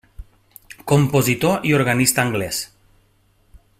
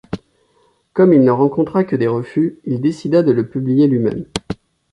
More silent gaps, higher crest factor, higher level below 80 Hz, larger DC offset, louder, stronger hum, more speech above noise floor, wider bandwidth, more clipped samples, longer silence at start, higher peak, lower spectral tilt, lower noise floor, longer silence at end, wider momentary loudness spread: neither; first, 20 dB vs 14 dB; about the same, -48 dBFS vs -48 dBFS; neither; about the same, -18 LUFS vs -16 LUFS; neither; about the same, 41 dB vs 44 dB; first, 16 kHz vs 11.5 kHz; neither; about the same, 0.2 s vs 0.1 s; about the same, -2 dBFS vs -2 dBFS; second, -4.5 dB/octave vs -8 dB/octave; about the same, -59 dBFS vs -58 dBFS; first, 1.15 s vs 0.4 s; second, 11 LU vs 14 LU